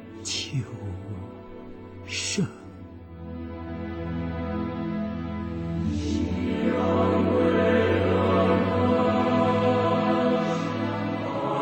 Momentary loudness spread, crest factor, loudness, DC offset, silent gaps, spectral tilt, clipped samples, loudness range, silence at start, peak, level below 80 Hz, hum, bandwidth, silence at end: 17 LU; 16 dB; -25 LUFS; under 0.1%; none; -6 dB/octave; under 0.1%; 11 LU; 0 s; -10 dBFS; -46 dBFS; none; 16.5 kHz; 0 s